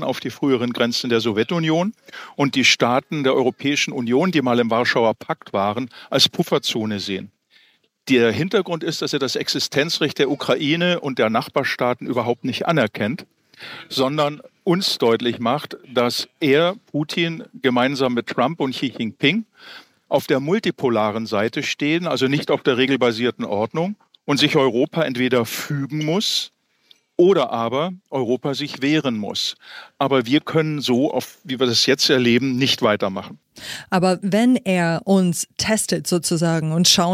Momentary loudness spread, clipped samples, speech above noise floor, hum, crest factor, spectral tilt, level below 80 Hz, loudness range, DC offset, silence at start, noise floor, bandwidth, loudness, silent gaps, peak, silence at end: 9 LU; under 0.1%; 38 dB; none; 18 dB; -4.5 dB/octave; -64 dBFS; 3 LU; under 0.1%; 0 s; -58 dBFS; 16 kHz; -20 LUFS; none; -2 dBFS; 0 s